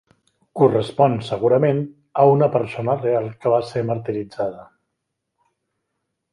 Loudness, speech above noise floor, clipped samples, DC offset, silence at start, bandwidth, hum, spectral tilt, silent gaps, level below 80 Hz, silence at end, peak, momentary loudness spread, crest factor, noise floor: -20 LUFS; 59 dB; under 0.1%; under 0.1%; 0.55 s; 11 kHz; none; -8.5 dB/octave; none; -60 dBFS; 1.7 s; -2 dBFS; 11 LU; 18 dB; -78 dBFS